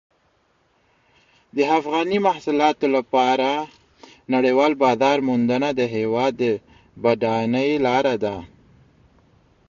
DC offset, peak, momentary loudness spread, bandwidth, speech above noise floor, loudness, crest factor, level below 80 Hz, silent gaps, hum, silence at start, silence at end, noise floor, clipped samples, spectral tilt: under 0.1%; -4 dBFS; 7 LU; 7.4 kHz; 44 dB; -20 LUFS; 16 dB; -60 dBFS; none; none; 1.55 s; 1.2 s; -63 dBFS; under 0.1%; -6 dB/octave